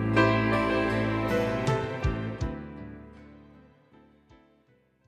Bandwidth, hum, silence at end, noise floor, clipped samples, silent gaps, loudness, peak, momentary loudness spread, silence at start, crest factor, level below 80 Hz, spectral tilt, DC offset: 13 kHz; none; 1.65 s; -65 dBFS; under 0.1%; none; -27 LUFS; -8 dBFS; 20 LU; 0 s; 20 dB; -44 dBFS; -7 dB/octave; under 0.1%